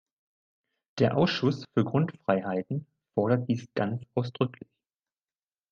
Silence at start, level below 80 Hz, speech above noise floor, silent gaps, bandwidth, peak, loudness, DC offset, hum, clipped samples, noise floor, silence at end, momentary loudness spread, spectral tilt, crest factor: 0.95 s; -66 dBFS; over 62 dB; none; 7.2 kHz; -10 dBFS; -29 LUFS; under 0.1%; none; under 0.1%; under -90 dBFS; 1.2 s; 8 LU; -7.5 dB/octave; 20 dB